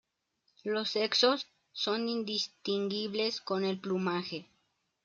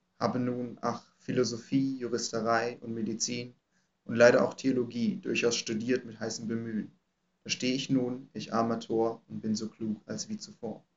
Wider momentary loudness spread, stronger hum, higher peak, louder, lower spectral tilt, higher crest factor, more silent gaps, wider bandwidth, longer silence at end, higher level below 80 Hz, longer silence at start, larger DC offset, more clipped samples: about the same, 10 LU vs 10 LU; neither; second, -14 dBFS vs -6 dBFS; about the same, -32 LUFS vs -31 LUFS; about the same, -4 dB/octave vs -4.5 dB/octave; about the same, 20 dB vs 24 dB; neither; about the same, 7.6 kHz vs 8 kHz; first, 0.6 s vs 0.2 s; about the same, -82 dBFS vs -78 dBFS; first, 0.65 s vs 0.2 s; neither; neither